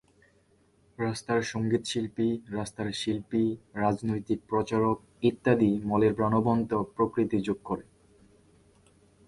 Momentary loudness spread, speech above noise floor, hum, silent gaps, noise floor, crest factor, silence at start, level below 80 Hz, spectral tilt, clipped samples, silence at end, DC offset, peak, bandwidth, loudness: 9 LU; 37 dB; none; none; -65 dBFS; 20 dB; 1 s; -58 dBFS; -6.5 dB/octave; under 0.1%; 1.45 s; under 0.1%; -10 dBFS; 11.5 kHz; -29 LUFS